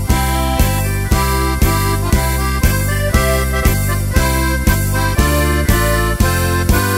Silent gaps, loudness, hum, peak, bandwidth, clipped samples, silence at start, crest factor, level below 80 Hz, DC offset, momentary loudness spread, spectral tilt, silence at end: none; -15 LUFS; none; 0 dBFS; 16.5 kHz; under 0.1%; 0 s; 14 dB; -18 dBFS; under 0.1%; 2 LU; -5 dB/octave; 0 s